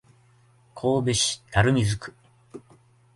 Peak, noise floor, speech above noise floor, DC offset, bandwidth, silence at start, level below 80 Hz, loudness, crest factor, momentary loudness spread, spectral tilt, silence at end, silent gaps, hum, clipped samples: -6 dBFS; -58 dBFS; 35 dB; under 0.1%; 11.5 kHz; 0.75 s; -46 dBFS; -24 LUFS; 20 dB; 10 LU; -4.5 dB/octave; 0.55 s; none; none; under 0.1%